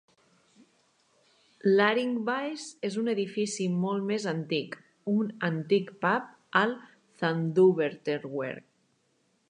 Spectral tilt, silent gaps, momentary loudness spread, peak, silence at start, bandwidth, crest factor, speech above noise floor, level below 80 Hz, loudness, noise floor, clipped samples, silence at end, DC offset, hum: -5.5 dB/octave; none; 12 LU; -8 dBFS; 1.65 s; 10 kHz; 22 dB; 44 dB; -80 dBFS; -29 LUFS; -71 dBFS; under 0.1%; 0.9 s; under 0.1%; none